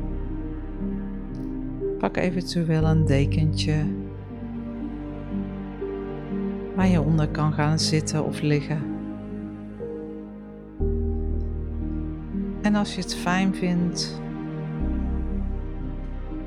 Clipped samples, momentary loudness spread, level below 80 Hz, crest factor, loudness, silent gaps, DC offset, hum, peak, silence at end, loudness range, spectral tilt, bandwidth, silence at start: under 0.1%; 13 LU; -34 dBFS; 18 dB; -27 LUFS; none; under 0.1%; none; -8 dBFS; 0 s; 6 LU; -6 dB/octave; 12 kHz; 0 s